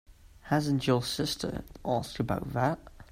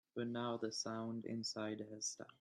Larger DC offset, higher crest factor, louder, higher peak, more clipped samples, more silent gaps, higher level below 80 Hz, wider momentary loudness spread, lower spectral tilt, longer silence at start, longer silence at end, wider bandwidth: neither; about the same, 18 dB vs 16 dB; first, -31 LUFS vs -44 LUFS; first, -12 dBFS vs -28 dBFS; neither; neither; first, -52 dBFS vs -88 dBFS; first, 8 LU vs 3 LU; first, -5.5 dB/octave vs -3.5 dB/octave; about the same, 0.1 s vs 0.15 s; about the same, 0.1 s vs 0.1 s; first, 16 kHz vs 12 kHz